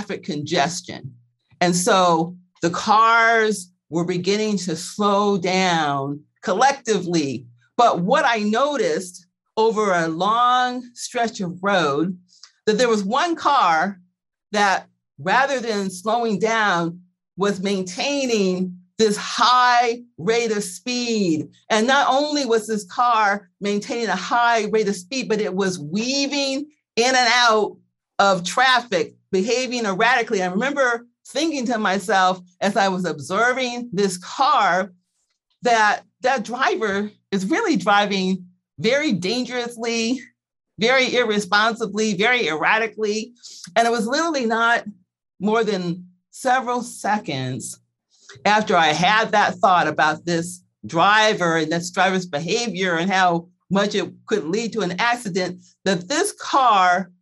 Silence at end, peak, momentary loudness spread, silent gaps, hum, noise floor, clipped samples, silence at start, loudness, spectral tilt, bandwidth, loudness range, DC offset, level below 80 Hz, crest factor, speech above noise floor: 0.15 s; -2 dBFS; 10 LU; none; none; -72 dBFS; under 0.1%; 0 s; -20 LUFS; -4 dB/octave; 12.5 kHz; 3 LU; under 0.1%; -68 dBFS; 18 dB; 53 dB